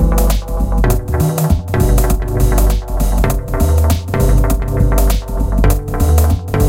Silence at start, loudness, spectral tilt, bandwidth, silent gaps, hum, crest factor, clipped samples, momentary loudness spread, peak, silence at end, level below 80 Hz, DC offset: 0 s; -15 LUFS; -6.5 dB/octave; 17 kHz; none; none; 12 dB; under 0.1%; 4 LU; 0 dBFS; 0 s; -14 dBFS; under 0.1%